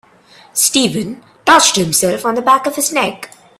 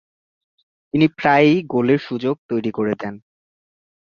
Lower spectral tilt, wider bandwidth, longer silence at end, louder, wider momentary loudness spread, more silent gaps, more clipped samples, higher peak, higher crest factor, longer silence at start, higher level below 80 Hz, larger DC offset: second, -2 dB/octave vs -8 dB/octave; first, 16.5 kHz vs 6.8 kHz; second, 0.35 s vs 0.85 s; first, -13 LUFS vs -19 LUFS; first, 13 LU vs 10 LU; second, none vs 2.38-2.49 s; neither; about the same, 0 dBFS vs -2 dBFS; about the same, 14 dB vs 18 dB; second, 0.55 s vs 0.95 s; first, -54 dBFS vs -60 dBFS; neither